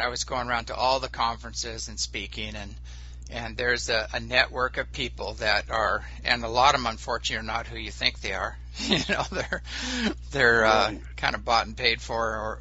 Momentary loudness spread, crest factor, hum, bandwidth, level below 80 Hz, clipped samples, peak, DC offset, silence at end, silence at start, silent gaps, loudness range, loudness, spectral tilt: 12 LU; 24 dB; none; 8 kHz; -40 dBFS; under 0.1%; -4 dBFS; under 0.1%; 0 s; 0 s; none; 5 LU; -26 LUFS; -1.5 dB/octave